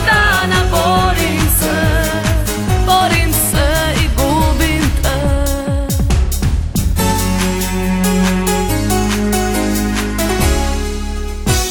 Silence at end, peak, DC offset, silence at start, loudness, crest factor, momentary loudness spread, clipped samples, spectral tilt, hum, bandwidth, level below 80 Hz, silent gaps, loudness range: 0 s; 0 dBFS; under 0.1%; 0 s; -14 LUFS; 14 dB; 5 LU; under 0.1%; -4.5 dB/octave; none; 19.5 kHz; -18 dBFS; none; 2 LU